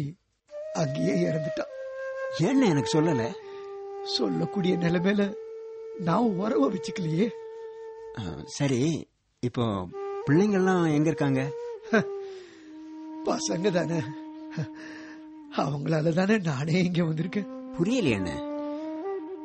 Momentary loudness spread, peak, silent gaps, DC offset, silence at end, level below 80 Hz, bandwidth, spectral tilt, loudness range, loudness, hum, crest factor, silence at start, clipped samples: 17 LU; -10 dBFS; none; under 0.1%; 0 s; -60 dBFS; 8.4 kHz; -6 dB/octave; 4 LU; -27 LUFS; none; 18 dB; 0 s; under 0.1%